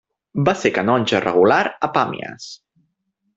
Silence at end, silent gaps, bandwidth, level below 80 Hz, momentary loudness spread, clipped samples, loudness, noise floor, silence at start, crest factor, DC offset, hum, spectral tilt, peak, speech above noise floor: 0.8 s; none; 8 kHz; -56 dBFS; 16 LU; under 0.1%; -18 LUFS; -71 dBFS; 0.35 s; 20 dB; under 0.1%; none; -5.5 dB/octave; 0 dBFS; 53 dB